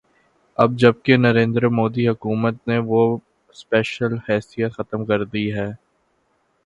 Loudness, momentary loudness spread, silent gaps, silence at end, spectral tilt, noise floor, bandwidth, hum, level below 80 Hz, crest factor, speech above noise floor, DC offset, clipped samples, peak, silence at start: -20 LUFS; 10 LU; none; 0.9 s; -7.5 dB/octave; -66 dBFS; 9.4 kHz; none; -54 dBFS; 20 dB; 47 dB; under 0.1%; under 0.1%; 0 dBFS; 0.6 s